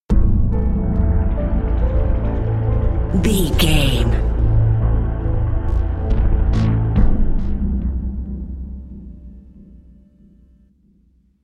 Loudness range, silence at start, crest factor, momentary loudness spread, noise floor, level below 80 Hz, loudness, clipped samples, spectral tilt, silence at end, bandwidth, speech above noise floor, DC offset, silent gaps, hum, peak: 11 LU; 0.1 s; 16 dB; 12 LU; -56 dBFS; -20 dBFS; -19 LUFS; under 0.1%; -6.5 dB/octave; 2.05 s; 14 kHz; 41 dB; under 0.1%; none; none; 0 dBFS